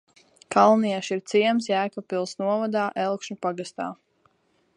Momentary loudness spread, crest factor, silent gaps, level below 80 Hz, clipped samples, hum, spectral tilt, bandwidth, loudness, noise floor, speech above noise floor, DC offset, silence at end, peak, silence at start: 12 LU; 20 dB; none; -76 dBFS; under 0.1%; none; -5 dB/octave; 10.5 kHz; -24 LUFS; -67 dBFS; 43 dB; under 0.1%; 0.85 s; -4 dBFS; 0.5 s